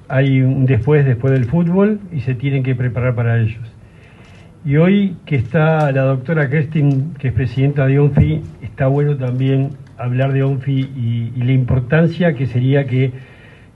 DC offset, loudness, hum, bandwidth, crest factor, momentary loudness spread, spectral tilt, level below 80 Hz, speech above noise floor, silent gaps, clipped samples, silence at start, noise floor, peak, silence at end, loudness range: under 0.1%; -16 LUFS; none; 4.3 kHz; 14 dB; 7 LU; -10 dB/octave; -40 dBFS; 26 dB; none; under 0.1%; 0.1 s; -41 dBFS; 0 dBFS; 0.5 s; 3 LU